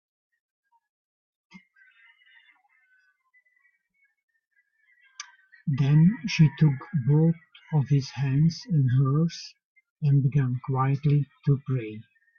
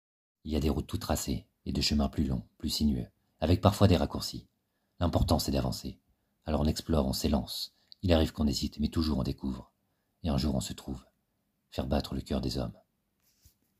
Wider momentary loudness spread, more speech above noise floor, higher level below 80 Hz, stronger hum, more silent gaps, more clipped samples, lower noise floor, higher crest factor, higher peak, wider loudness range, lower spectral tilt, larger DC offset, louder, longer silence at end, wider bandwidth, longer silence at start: first, 19 LU vs 14 LU; about the same, 48 dB vs 48 dB; second, -60 dBFS vs -42 dBFS; neither; first, 9.65-9.75 s, 9.90-9.96 s vs none; neither; second, -71 dBFS vs -78 dBFS; second, 18 dB vs 26 dB; second, -10 dBFS vs -4 dBFS; about the same, 5 LU vs 6 LU; first, -8 dB/octave vs -6 dB/octave; neither; first, -24 LUFS vs -31 LUFS; second, 0.35 s vs 1.1 s; second, 6.8 kHz vs 15.5 kHz; first, 5.2 s vs 0.45 s